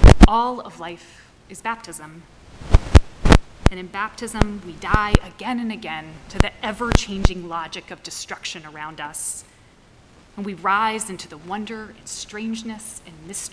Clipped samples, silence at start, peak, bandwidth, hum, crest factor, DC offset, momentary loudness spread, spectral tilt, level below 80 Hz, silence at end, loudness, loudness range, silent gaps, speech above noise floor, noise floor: under 0.1%; 0 s; 0 dBFS; 11 kHz; none; 20 dB; under 0.1%; 18 LU; -5.5 dB/octave; -22 dBFS; 0.05 s; -22 LUFS; 7 LU; none; 26 dB; -51 dBFS